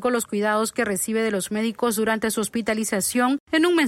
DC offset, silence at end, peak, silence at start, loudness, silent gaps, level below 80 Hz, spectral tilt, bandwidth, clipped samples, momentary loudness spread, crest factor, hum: under 0.1%; 0 s; -8 dBFS; 0 s; -23 LUFS; 3.40-3.47 s; -60 dBFS; -3.5 dB/octave; 16.5 kHz; under 0.1%; 3 LU; 16 dB; none